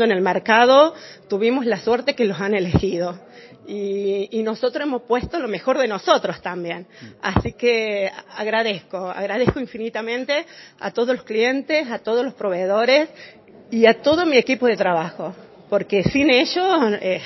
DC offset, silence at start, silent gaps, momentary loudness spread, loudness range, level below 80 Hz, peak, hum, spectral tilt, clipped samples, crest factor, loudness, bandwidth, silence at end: under 0.1%; 0 s; none; 13 LU; 5 LU; -44 dBFS; 0 dBFS; none; -5.5 dB/octave; under 0.1%; 20 dB; -20 LUFS; 6.2 kHz; 0 s